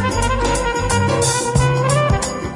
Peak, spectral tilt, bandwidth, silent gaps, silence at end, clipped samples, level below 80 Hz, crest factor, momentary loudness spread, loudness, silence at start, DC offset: -2 dBFS; -4.5 dB/octave; 11.5 kHz; none; 0 s; under 0.1%; -28 dBFS; 14 dB; 2 LU; -17 LUFS; 0 s; under 0.1%